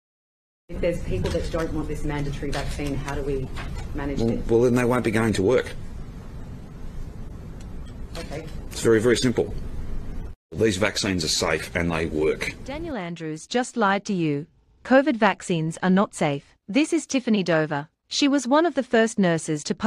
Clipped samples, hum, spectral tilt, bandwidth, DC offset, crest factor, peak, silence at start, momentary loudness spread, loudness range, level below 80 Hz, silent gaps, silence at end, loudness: under 0.1%; none; -5 dB/octave; 13.5 kHz; under 0.1%; 18 dB; -6 dBFS; 0.7 s; 19 LU; 6 LU; -36 dBFS; 10.36-10.49 s; 0 s; -24 LUFS